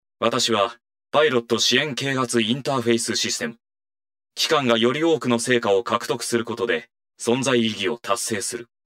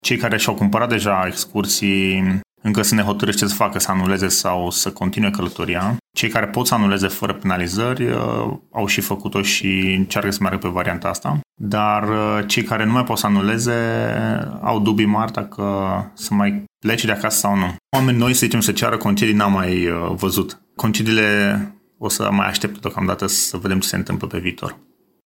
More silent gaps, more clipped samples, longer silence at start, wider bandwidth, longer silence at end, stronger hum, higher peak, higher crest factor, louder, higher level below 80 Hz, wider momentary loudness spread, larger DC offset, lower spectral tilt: second, none vs 11.46-11.50 s; neither; first, 0.2 s vs 0.05 s; about the same, 16 kHz vs 17 kHz; second, 0.25 s vs 0.5 s; neither; about the same, -2 dBFS vs -2 dBFS; about the same, 20 dB vs 18 dB; about the same, -21 LUFS vs -19 LUFS; second, -70 dBFS vs -52 dBFS; about the same, 7 LU vs 7 LU; neither; about the same, -3 dB/octave vs -4 dB/octave